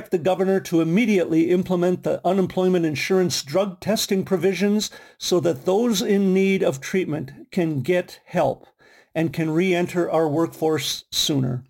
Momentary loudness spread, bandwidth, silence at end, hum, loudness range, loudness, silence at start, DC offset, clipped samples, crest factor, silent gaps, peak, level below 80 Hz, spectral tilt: 6 LU; 17 kHz; 0.05 s; none; 3 LU; -22 LUFS; 0 s; under 0.1%; under 0.1%; 12 dB; none; -10 dBFS; -60 dBFS; -5 dB/octave